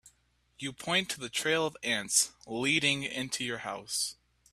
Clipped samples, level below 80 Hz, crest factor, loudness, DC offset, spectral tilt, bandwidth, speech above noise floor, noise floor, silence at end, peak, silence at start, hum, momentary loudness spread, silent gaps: under 0.1%; -68 dBFS; 24 dB; -30 LUFS; under 0.1%; -1.5 dB/octave; 15.5 kHz; 38 dB; -70 dBFS; 0.4 s; -10 dBFS; 0.05 s; none; 10 LU; none